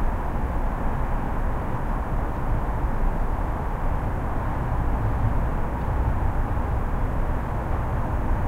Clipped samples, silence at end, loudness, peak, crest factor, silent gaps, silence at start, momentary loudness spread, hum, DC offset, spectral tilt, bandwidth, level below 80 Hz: under 0.1%; 0 s; -28 LUFS; -10 dBFS; 12 dB; none; 0 s; 3 LU; none; under 0.1%; -8.5 dB/octave; 4.1 kHz; -26 dBFS